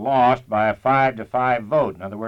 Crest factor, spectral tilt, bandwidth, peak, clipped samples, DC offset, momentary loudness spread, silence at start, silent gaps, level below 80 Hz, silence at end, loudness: 16 dB; -8 dB/octave; 7 kHz; -4 dBFS; under 0.1%; under 0.1%; 4 LU; 0 s; none; -52 dBFS; 0 s; -20 LUFS